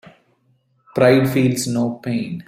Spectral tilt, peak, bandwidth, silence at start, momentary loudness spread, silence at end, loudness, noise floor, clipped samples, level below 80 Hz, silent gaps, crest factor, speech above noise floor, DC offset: -6 dB/octave; -2 dBFS; 16 kHz; 0.95 s; 10 LU; 0.05 s; -18 LUFS; -62 dBFS; under 0.1%; -56 dBFS; none; 18 dB; 45 dB; under 0.1%